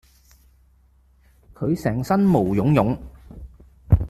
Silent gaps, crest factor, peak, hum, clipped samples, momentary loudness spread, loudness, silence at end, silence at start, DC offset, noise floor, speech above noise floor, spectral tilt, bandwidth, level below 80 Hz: none; 18 dB; -4 dBFS; none; under 0.1%; 25 LU; -21 LUFS; 0 s; 1.6 s; under 0.1%; -57 dBFS; 37 dB; -9 dB/octave; 13.5 kHz; -36 dBFS